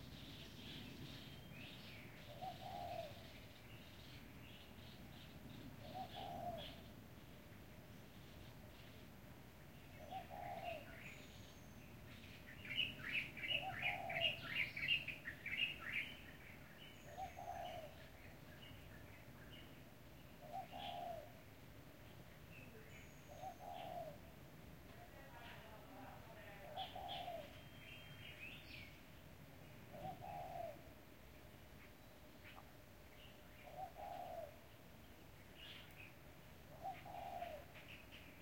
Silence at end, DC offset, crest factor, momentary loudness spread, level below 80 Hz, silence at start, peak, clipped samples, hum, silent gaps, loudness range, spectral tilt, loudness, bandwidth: 0 s; under 0.1%; 26 dB; 18 LU; -68 dBFS; 0 s; -28 dBFS; under 0.1%; none; none; 14 LU; -4 dB/octave; -50 LUFS; 16.5 kHz